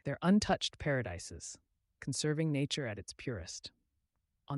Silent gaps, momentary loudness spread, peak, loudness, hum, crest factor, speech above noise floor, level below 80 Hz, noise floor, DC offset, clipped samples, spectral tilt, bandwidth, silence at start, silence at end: none; 17 LU; -18 dBFS; -35 LUFS; none; 18 dB; 47 dB; -60 dBFS; -82 dBFS; under 0.1%; under 0.1%; -5 dB/octave; 11.5 kHz; 0.05 s; 0 s